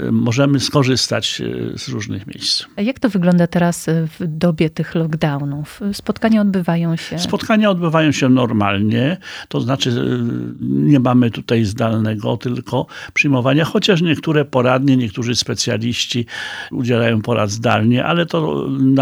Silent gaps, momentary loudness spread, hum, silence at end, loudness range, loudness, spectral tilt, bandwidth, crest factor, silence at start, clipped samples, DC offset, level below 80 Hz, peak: none; 8 LU; none; 0 s; 2 LU; -17 LUFS; -5.5 dB/octave; over 20 kHz; 16 dB; 0 s; under 0.1%; under 0.1%; -50 dBFS; 0 dBFS